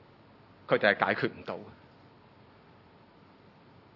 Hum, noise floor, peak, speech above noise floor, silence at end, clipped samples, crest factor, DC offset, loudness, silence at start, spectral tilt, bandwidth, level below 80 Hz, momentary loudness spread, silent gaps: none; -57 dBFS; -8 dBFS; 28 dB; 2.25 s; under 0.1%; 28 dB; under 0.1%; -29 LUFS; 0.7 s; -7.5 dB/octave; 6 kHz; -76 dBFS; 24 LU; none